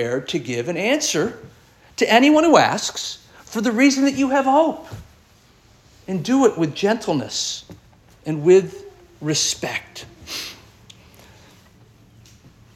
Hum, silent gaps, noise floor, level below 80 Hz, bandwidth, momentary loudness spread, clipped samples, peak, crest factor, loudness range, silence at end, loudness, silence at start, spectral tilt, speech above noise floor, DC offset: none; none; -53 dBFS; -56 dBFS; 15 kHz; 20 LU; under 0.1%; 0 dBFS; 20 dB; 10 LU; 2.2 s; -19 LUFS; 0 s; -4 dB/octave; 34 dB; under 0.1%